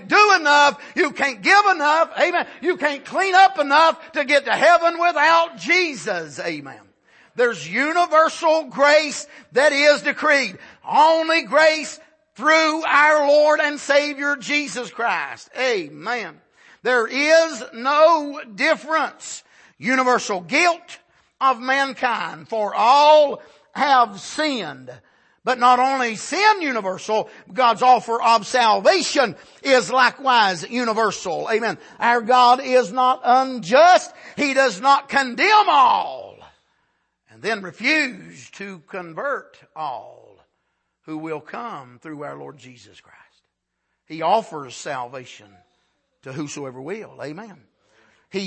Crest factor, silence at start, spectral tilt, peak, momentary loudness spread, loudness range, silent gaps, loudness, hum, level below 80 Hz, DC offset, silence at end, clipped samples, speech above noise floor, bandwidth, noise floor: 16 dB; 0 s; -2.5 dB/octave; -2 dBFS; 18 LU; 12 LU; none; -18 LUFS; none; -72 dBFS; under 0.1%; 0 s; under 0.1%; 57 dB; 8.8 kHz; -75 dBFS